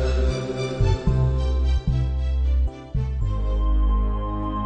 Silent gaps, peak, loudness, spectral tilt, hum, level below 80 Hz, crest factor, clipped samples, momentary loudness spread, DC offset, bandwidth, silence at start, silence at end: none; -8 dBFS; -24 LUFS; -7.5 dB/octave; none; -22 dBFS; 12 dB; under 0.1%; 5 LU; under 0.1%; 8.6 kHz; 0 s; 0 s